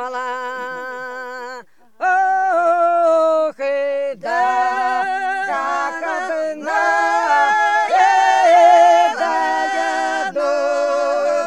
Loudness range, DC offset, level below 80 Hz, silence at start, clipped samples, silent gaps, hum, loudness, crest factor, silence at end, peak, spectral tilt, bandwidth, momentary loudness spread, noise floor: 6 LU; 0.4%; -78 dBFS; 0 s; under 0.1%; none; none; -16 LUFS; 14 dB; 0 s; -2 dBFS; -1.5 dB/octave; 11 kHz; 14 LU; -38 dBFS